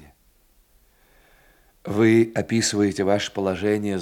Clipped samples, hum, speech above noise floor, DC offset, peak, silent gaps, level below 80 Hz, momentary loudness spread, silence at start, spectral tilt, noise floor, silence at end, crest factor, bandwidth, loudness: under 0.1%; none; 38 dB; under 0.1%; -6 dBFS; none; -60 dBFS; 8 LU; 1.85 s; -5 dB/octave; -59 dBFS; 0 s; 16 dB; 16 kHz; -21 LUFS